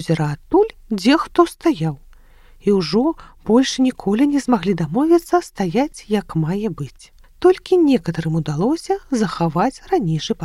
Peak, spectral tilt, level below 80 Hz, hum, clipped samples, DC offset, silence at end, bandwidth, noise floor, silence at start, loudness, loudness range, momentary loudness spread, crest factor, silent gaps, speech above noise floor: 0 dBFS; -6.5 dB/octave; -46 dBFS; none; under 0.1%; under 0.1%; 0 s; 13.5 kHz; -45 dBFS; 0 s; -18 LUFS; 2 LU; 7 LU; 18 dB; none; 28 dB